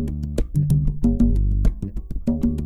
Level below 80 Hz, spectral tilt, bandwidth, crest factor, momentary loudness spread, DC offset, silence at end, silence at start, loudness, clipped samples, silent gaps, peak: -24 dBFS; -9.5 dB/octave; 13.5 kHz; 14 dB; 8 LU; under 0.1%; 0 s; 0 s; -22 LUFS; under 0.1%; none; -6 dBFS